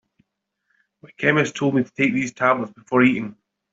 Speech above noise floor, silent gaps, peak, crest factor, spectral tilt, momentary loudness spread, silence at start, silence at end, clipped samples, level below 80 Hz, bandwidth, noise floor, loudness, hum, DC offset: 53 dB; none; -2 dBFS; 20 dB; -6 dB/octave; 6 LU; 1.05 s; 0.4 s; under 0.1%; -64 dBFS; 7.8 kHz; -74 dBFS; -20 LUFS; none; under 0.1%